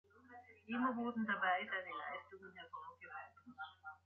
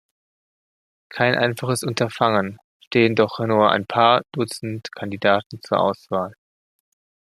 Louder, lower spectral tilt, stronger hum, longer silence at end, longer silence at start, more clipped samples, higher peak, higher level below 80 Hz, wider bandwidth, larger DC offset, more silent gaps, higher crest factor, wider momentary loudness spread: second, -43 LUFS vs -20 LUFS; second, -2 dB/octave vs -5 dB/octave; neither; second, 0.1 s vs 1.05 s; second, 0.15 s vs 1.1 s; neither; second, -24 dBFS vs -2 dBFS; second, -82 dBFS vs -64 dBFS; second, 4.3 kHz vs 14 kHz; neither; second, none vs 2.64-2.80 s, 2.87-2.91 s, 5.46-5.50 s; about the same, 20 dB vs 20 dB; first, 21 LU vs 13 LU